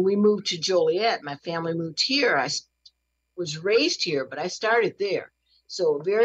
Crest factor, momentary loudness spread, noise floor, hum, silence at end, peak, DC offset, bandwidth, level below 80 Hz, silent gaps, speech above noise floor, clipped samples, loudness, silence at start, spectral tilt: 14 dB; 10 LU; -66 dBFS; none; 0 s; -10 dBFS; under 0.1%; 8.4 kHz; -76 dBFS; none; 42 dB; under 0.1%; -24 LUFS; 0 s; -3.5 dB/octave